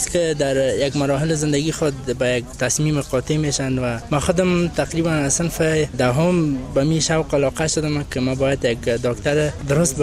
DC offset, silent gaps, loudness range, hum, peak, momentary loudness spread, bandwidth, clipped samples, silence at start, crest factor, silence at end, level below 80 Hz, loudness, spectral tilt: under 0.1%; none; 1 LU; none; -4 dBFS; 4 LU; 15 kHz; under 0.1%; 0 s; 16 dB; 0 s; -38 dBFS; -20 LUFS; -5 dB/octave